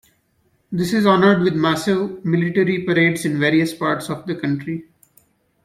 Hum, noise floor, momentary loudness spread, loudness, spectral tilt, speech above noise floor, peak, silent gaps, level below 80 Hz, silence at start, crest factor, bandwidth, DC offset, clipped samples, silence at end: none; -63 dBFS; 11 LU; -18 LUFS; -6 dB/octave; 45 dB; -2 dBFS; none; -58 dBFS; 0.7 s; 18 dB; 16 kHz; under 0.1%; under 0.1%; 0.8 s